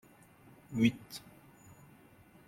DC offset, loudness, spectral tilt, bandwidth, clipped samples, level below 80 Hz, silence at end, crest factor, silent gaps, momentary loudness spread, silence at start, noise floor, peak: under 0.1%; -33 LUFS; -6 dB/octave; 16 kHz; under 0.1%; -70 dBFS; 1.3 s; 22 dB; none; 27 LU; 0.7 s; -60 dBFS; -16 dBFS